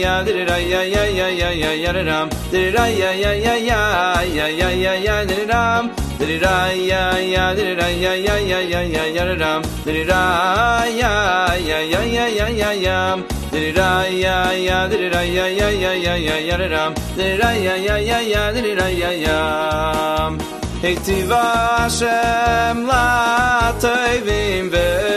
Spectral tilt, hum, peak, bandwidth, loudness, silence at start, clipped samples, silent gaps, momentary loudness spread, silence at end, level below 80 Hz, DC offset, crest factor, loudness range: -4.5 dB/octave; none; -2 dBFS; 13.5 kHz; -17 LUFS; 0 s; under 0.1%; none; 4 LU; 0 s; -30 dBFS; under 0.1%; 16 dB; 2 LU